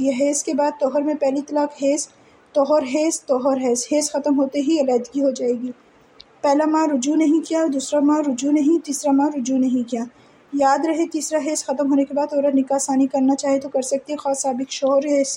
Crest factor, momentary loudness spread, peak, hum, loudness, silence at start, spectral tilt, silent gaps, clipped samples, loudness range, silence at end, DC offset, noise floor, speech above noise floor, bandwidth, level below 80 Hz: 14 dB; 5 LU; -6 dBFS; none; -20 LUFS; 0 s; -3 dB/octave; none; under 0.1%; 2 LU; 0 s; under 0.1%; -49 dBFS; 30 dB; 15.5 kHz; -72 dBFS